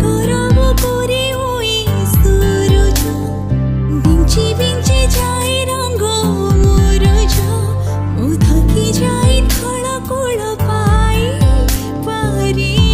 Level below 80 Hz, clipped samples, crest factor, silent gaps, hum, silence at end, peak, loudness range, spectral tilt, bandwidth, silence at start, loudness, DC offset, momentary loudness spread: -16 dBFS; under 0.1%; 12 dB; none; none; 0 s; 0 dBFS; 1 LU; -5.5 dB/octave; 15.5 kHz; 0 s; -14 LUFS; 0.7%; 6 LU